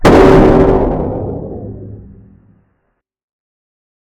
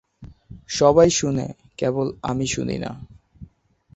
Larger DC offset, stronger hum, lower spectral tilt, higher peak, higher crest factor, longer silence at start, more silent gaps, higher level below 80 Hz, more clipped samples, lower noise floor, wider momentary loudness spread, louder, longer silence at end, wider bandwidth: neither; neither; first, -7.5 dB/octave vs -5 dB/octave; about the same, 0 dBFS vs -2 dBFS; second, 12 dB vs 20 dB; second, 0 s vs 0.2 s; neither; first, -24 dBFS vs -48 dBFS; first, 1% vs under 0.1%; first, -66 dBFS vs -55 dBFS; first, 23 LU vs 16 LU; first, -10 LUFS vs -21 LUFS; first, 2 s vs 0.5 s; first, 12 kHz vs 8.2 kHz